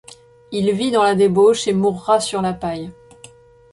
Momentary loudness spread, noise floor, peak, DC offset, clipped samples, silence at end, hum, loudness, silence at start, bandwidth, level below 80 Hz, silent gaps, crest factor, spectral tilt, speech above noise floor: 13 LU; -45 dBFS; -4 dBFS; under 0.1%; under 0.1%; 0.8 s; none; -17 LUFS; 0.5 s; 11.5 kHz; -52 dBFS; none; 16 dB; -5 dB/octave; 29 dB